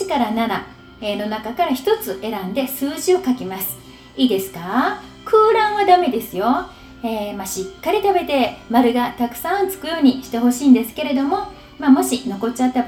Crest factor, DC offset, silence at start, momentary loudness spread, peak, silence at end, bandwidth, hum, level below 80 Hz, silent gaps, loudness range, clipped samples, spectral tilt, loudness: 18 dB; under 0.1%; 0 s; 11 LU; 0 dBFS; 0 s; over 20 kHz; none; -50 dBFS; none; 4 LU; under 0.1%; -4 dB/octave; -19 LUFS